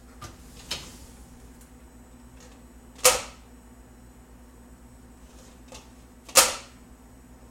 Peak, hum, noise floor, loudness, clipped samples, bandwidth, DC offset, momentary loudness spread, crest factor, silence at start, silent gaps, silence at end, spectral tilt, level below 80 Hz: 0 dBFS; 60 Hz at -60 dBFS; -50 dBFS; -22 LUFS; under 0.1%; 16.5 kHz; under 0.1%; 29 LU; 32 dB; 0.2 s; none; 0.9 s; 0 dB/octave; -52 dBFS